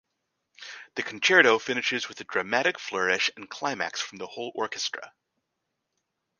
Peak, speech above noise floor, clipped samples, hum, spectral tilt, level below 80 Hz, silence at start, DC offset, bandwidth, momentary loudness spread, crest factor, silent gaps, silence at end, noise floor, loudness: -4 dBFS; 54 dB; under 0.1%; none; -2 dB/octave; -74 dBFS; 0.6 s; under 0.1%; 10 kHz; 17 LU; 26 dB; none; 1.3 s; -81 dBFS; -26 LUFS